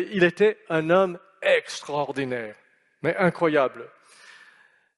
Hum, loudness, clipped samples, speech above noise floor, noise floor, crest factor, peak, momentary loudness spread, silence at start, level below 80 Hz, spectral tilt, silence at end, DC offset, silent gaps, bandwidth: none; -24 LUFS; under 0.1%; 34 dB; -58 dBFS; 20 dB; -4 dBFS; 10 LU; 0 s; -70 dBFS; -5.5 dB/octave; 1.1 s; under 0.1%; none; 11.5 kHz